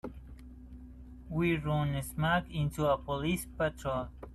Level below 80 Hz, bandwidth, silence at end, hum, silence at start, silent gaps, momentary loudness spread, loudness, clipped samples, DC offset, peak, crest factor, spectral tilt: -48 dBFS; 13.5 kHz; 0 s; none; 0.05 s; none; 21 LU; -33 LUFS; under 0.1%; under 0.1%; -16 dBFS; 18 dB; -6 dB/octave